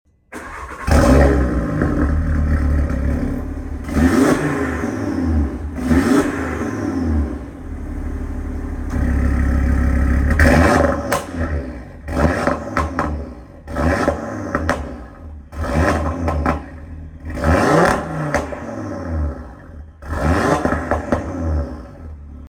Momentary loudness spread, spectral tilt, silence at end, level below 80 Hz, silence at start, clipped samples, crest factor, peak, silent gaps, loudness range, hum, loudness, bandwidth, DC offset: 18 LU; -7 dB/octave; 0 s; -24 dBFS; 0.3 s; under 0.1%; 18 dB; -2 dBFS; none; 5 LU; none; -19 LUFS; 16 kHz; under 0.1%